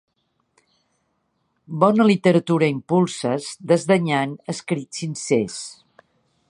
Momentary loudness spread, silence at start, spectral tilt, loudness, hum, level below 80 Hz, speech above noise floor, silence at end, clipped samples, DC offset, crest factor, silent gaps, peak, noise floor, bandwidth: 13 LU; 1.7 s; -6 dB/octave; -20 LUFS; none; -66 dBFS; 50 dB; 0.75 s; under 0.1%; under 0.1%; 20 dB; none; -2 dBFS; -70 dBFS; 11.5 kHz